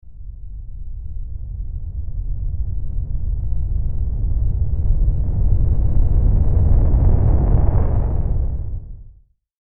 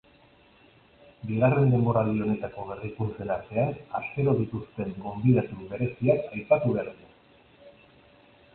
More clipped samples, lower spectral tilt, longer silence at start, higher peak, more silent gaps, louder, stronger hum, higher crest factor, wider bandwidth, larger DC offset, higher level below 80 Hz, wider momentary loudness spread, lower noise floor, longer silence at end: neither; second, -11.5 dB/octave vs -13 dB/octave; second, 0.05 s vs 1.25 s; first, -2 dBFS vs -8 dBFS; neither; first, -21 LUFS vs -27 LUFS; neither; second, 14 dB vs 20 dB; second, 2 kHz vs 4.2 kHz; neither; first, -18 dBFS vs -56 dBFS; first, 17 LU vs 13 LU; second, -48 dBFS vs -58 dBFS; second, 0.5 s vs 0.85 s